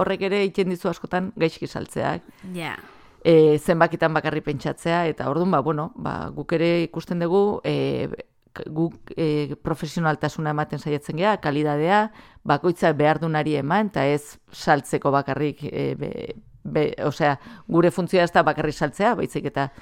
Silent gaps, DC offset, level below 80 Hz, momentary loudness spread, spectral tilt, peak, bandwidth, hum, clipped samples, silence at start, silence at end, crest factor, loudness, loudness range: none; under 0.1%; -54 dBFS; 12 LU; -6.5 dB/octave; -2 dBFS; 16 kHz; none; under 0.1%; 0 s; 0.15 s; 20 dB; -23 LUFS; 4 LU